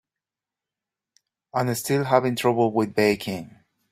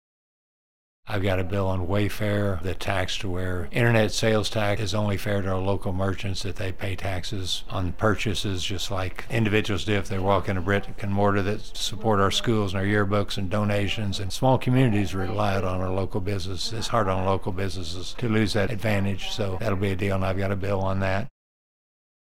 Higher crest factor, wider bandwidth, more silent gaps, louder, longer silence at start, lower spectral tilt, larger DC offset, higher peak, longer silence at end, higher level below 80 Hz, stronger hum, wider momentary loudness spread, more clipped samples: about the same, 22 dB vs 20 dB; about the same, 16 kHz vs 16 kHz; neither; first, -23 LUFS vs -26 LUFS; first, 1.55 s vs 1 s; about the same, -5.5 dB/octave vs -5.5 dB/octave; second, under 0.1% vs 3%; about the same, -4 dBFS vs -6 dBFS; second, 0.45 s vs 1 s; second, -64 dBFS vs -38 dBFS; neither; about the same, 10 LU vs 8 LU; neither